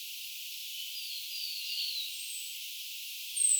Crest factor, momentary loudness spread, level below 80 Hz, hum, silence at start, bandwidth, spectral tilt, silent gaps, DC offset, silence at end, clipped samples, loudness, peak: 22 dB; 6 LU; under -90 dBFS; none; 0 s; over 20 kHz; 12.5 dB/octave; none; under 0.1%; 0 s; under 0.1%; -36 LUFS; -14 dBFS